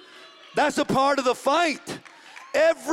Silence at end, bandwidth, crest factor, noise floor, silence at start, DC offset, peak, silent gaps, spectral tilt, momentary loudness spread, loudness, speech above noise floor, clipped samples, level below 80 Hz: 0 s; 16 kHz; 16 dB; -48 dBFS; 0.15 s; under 0.1%; -8 dBFS; none; -3.5 dB/octave; 15 LU; -23 LUFS; 26 dB; under 0.1%; -60 dBFS